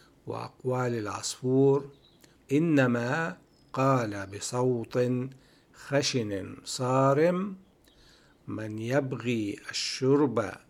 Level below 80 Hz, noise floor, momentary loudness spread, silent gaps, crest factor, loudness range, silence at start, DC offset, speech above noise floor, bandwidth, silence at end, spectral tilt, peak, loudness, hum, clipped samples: -68 dBFS; -59 dBFS; 14 LU; none; 18 dB; 2 LU; 0.25 s; under 0.1%; 31 dB; 14 kHz; 0.15 s; -5.5 dB/octave; -10 dBFS; -28 LUFS; none; under 0.1%